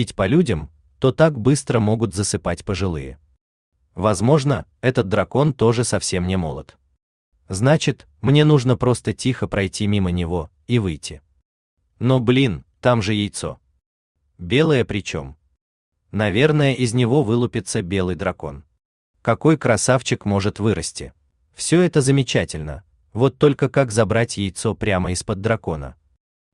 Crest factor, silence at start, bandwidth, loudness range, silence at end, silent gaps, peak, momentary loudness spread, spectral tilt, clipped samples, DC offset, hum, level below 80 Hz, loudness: 18 dB; 0 s; 12 kHz; 3 LU; 0.6 s; 3.41-3.72 s, 7.03-7.32 s, 11.45-11.77 s, 13.86-14.15 s, 15.61-15.92 s, 18.85-19.14 s; -2 dBFS; 13 LU; -5.5 dB/octave; under 0.1%; under 0.1%; none; -46 dBFS; -20 LUFS